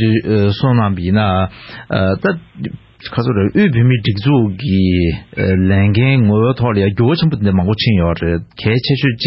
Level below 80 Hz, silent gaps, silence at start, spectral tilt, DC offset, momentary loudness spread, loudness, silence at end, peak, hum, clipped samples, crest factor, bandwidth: -30 dBFS; none; 0 s; -11 dB/octave; under 0.1%; 8 LU; -14 LUFS; 0 s; -2 dBFS; none; under 0.1%; 12 dB; 5.8 kHz